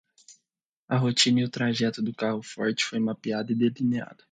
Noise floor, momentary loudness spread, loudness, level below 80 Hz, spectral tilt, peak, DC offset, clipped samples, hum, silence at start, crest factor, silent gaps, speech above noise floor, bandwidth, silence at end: -84 dBFS; 8 LU; -26 LUFS; -70 dBFS; -4.5 dB/octave; -6 dBFS; under 0.1%; under 0.1%; none; 0.3 s; 20 dB; 0.63-0.88 s; 58 dB; 9.4 kHz; 0.2 s